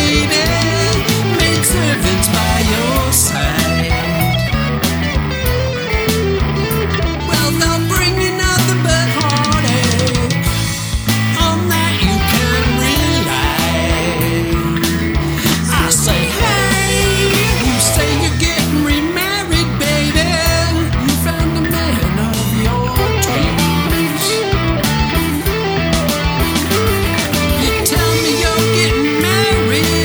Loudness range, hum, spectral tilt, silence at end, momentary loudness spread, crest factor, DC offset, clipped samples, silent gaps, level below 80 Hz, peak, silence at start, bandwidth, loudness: 2 LU; none; -4 dB/octave; 0 s; 4 LU; 14 dB; under 0.1%; under 0.1%; none; -24 dBFS; 0 dBFS; 0 s; over 20 kHz; -14 LUFS